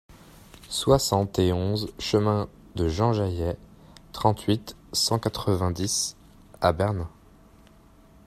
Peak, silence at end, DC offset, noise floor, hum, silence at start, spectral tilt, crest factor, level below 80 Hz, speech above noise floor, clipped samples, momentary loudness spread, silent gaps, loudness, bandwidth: -4 dBFS; 1.2 s; under 0.1%; -54 dBFS; none; 0.1 s; -5 dB/octave; 22 dB; -46 dBFS; 29 dB; under 0.1%; 9 LU; none; -26 LUFS; 15 kHz